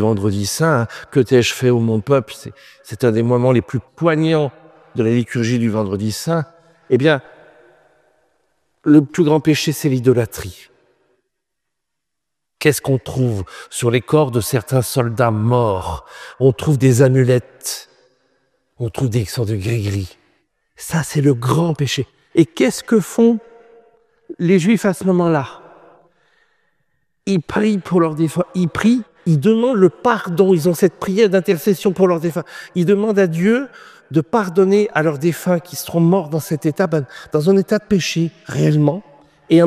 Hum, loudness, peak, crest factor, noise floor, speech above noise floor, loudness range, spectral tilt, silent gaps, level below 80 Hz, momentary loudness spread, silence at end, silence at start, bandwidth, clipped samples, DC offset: none; -17 LUFS; 0 dBFS; 16 dB; -80 dBFS; 64 dB; 5 LU; -6.5 dB/octave; none; -50 dBFS; 10 LU; 0 s; 0 s; 15.5 kHz; under 0.1%; under 0.1%